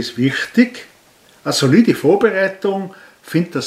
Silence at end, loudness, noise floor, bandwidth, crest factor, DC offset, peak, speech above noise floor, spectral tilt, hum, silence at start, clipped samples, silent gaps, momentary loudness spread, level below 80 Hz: 0 s; -16 LUFS; -50 dBFS; 15 kHz; 16 dB; under 0.1%; 0 dBFS; 34 dB; -5.5 dB/octave; none; 0 s; under 0.1%; none; 13 LU; -62 dBFS